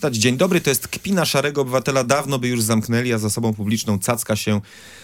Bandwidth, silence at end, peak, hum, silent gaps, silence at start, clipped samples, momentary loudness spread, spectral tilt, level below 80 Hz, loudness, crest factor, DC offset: 17 kHz; 0 s; -2 dBFS; none; none; 0 s; under 0.1%; 5 LU; -4.5 dB/octave; -56 dBFS; -20 LUFS; 18 dB; under 0.1%